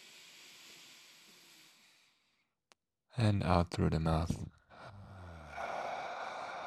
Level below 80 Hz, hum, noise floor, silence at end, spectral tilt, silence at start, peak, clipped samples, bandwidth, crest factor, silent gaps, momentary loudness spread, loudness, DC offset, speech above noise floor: -56 dBFS; none; -79 dBFS; 0 s; -7 dB/octave; 0 s; -14 dBFS; under 0.1%; 13.5 kHz; 26 dB; none; 24 LU; -35 LUFS; under 0.1%; 47 dB